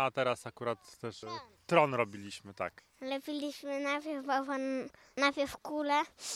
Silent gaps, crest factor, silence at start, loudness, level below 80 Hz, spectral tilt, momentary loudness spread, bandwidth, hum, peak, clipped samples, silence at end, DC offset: none; 24 dB; 0 s; -35 LUFS; -72 dBFS; -4 dB/octave; 14 LU; 15.5 kHz; none; -10 dBFS; under 0.1%; 0 s; under 0.1%